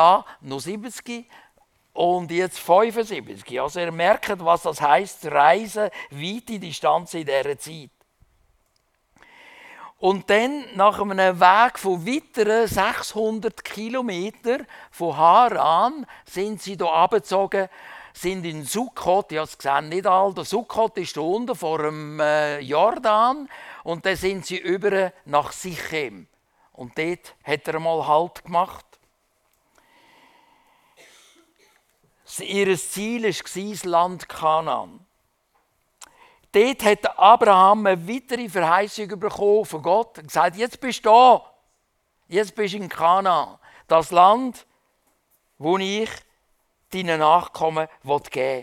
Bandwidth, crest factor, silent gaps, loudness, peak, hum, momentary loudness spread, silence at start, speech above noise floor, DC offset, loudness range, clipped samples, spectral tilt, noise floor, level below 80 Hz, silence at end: 17 kHz; 22 dB; none; -21 LUFS; 0 dBFS; none; 15 LU; 0 s; 49 dB; under 0.1%; 8 LU; under 0.1%; -4 dB/octave; -70 dBFS; -60 dBFS; 0 s